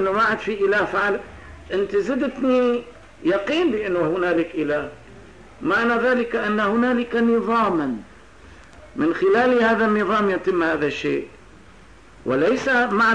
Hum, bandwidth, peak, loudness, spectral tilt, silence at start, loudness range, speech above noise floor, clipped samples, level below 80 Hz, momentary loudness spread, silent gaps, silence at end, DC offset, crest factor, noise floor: none; 10 kHz; -8 dBFS; -21 LUFS; -6 dB/octave; 0 s; 2 LU; 27 dB; under 0.1%; -52 dBFS; 10 LU; none; 0 s; 0.3%; 12 dB; -47 dBFS